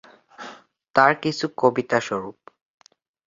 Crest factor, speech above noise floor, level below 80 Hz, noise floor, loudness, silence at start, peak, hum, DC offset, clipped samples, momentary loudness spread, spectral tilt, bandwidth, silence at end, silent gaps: 22 dB; 24 dB; -66 dBFS; -45 dBFS; -21 LUFS; 0.4 s; -2 dBFS; none; under 0.1%; under 0.1%; 22 LU; -5 dB/octave; 7.6 kHz; 0.95 s; 0.90-0.94 s